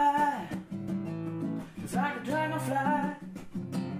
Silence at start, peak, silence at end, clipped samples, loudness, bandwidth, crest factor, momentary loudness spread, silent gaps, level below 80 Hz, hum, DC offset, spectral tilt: 0 s; -16 dBFS; 0 s; under 0.1%; -32 LUFS; 15.5 kHz; 16 dB; 10 LU; none; -62 dBFS; none; under 0.1%; -6.5 dB/octave